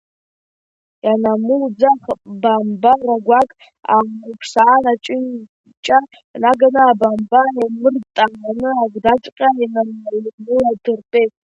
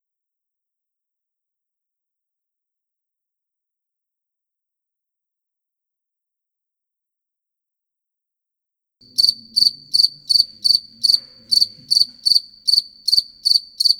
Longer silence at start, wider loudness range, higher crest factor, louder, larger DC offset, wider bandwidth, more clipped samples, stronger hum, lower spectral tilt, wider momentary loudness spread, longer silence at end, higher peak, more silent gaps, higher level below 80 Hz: second, 1.05 s vs 9.2 s; second, 3 LU vs 7 LU; second, 16 dB vs 22 dB; about the same, -15 LUFS vs -15 LUFS; neither; second, 8.4 kHz vs 20 kHz; neither; neither; first, -5.5 dB/octave vs 1 dB/octave; first, 11 LU vs 2 LU; first, 0.25 s vs 0 s; about the same, 0 dBFS vs 0 dBFS; first, 5.49-5.64 s, 5.77-5.83 s, 6.24-6.34 s, 9.32-9.36 s, 10.33-10.38 s vs none; first, -56 dBFS vs -64 dBFS